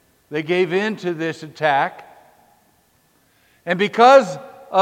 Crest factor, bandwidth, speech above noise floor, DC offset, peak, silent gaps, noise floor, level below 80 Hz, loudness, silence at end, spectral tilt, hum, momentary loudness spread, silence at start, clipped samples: 20 dB; 11.5 kHz; 42 dB; under 0.1%; 0 dBFS; none; -60 dBFS; -72 dBFS; -18 LUFS; 0 s; -5 dB/octave; none; 17 LU; 0.3 s; under 0.1%